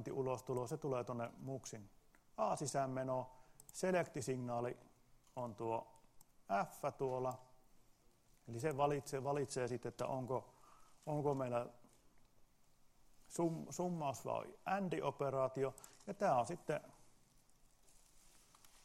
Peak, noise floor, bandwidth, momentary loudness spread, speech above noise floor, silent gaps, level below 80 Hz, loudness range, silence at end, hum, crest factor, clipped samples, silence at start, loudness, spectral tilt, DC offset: -24 dBFS; -71 dBFS; 16 kHz; 13 LU; 29 dB; none; -74 dBFS; 4 LU; 0.05 s; none; 20 dB; under 0.1%; 0 s; -42 LUFS; -6 dB/octave; under 0.1%